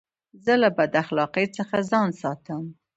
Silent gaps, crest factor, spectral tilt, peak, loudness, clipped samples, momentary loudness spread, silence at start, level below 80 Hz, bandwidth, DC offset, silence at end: none; 18 dB; -6 dB/octave; -6 dBFS; -24 LUFS; under 0.1%; 12 LU; 0.45 s; -66 dBFS; 8.2 kHz; under 0.1%; 0.25 s